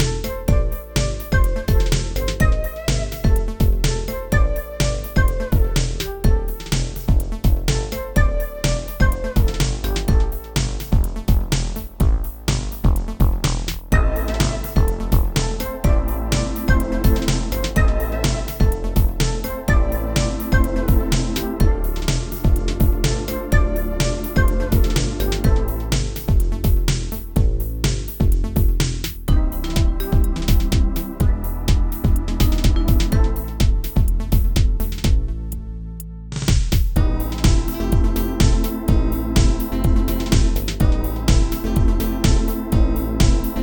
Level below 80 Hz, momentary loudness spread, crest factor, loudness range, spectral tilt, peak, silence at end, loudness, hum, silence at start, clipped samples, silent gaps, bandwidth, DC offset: -20 dBFS; 4 LU; 16 dB; 2 LU; -5.5 dB/octave; -2 dBFS; 0 s; -21 LUFS; none; 0 s; under 0.1%; none; 19.5 kHz; under 0.1%